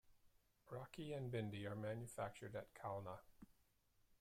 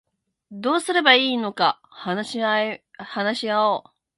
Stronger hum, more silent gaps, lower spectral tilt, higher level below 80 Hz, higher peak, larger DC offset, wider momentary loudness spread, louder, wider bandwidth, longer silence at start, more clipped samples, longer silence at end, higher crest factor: neither; neither; first, -6.5 dB/octave vs -3.5 dB/octave; about the same, -76 dBFS vs -74 dBFS; second, -34 dBFS vs -2 dBFS; neither; about the same, 12 LU vs 13 LU; second, -51 LUFS vs -21 LUFS; first, 16 kHz vs 11.5 kHz; second, 0.05 s vs 0.5 s; neither; second, 0.05 s vs 0.35 s; about the same, 18 dB vs 22 dB